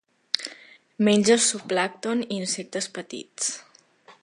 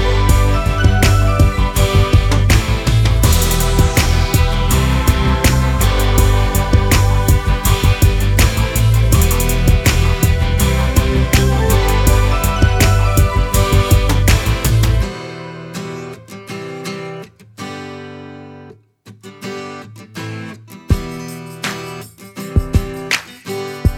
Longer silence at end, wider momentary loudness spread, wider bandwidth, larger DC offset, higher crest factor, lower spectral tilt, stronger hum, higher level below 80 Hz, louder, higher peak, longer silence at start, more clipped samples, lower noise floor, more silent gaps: about the same, 0.1 s vs 0 s; about the same, 16 LU vs 17 LU; second, 11.5 kHz vs 20 kHz; neither; first, 26 dB vs 14 dB; second, -3 dB/octave vs -5 dB/octave; neither; second, -72 dBFS vs -18 dBFS; second, -24 LUFS vs -14 LUFS; about the same, 0 dBFS vs 0 dBFS; first, 0.35 s vs 0 s; neither; first, -54 dBFS vs -43 dBFS; neither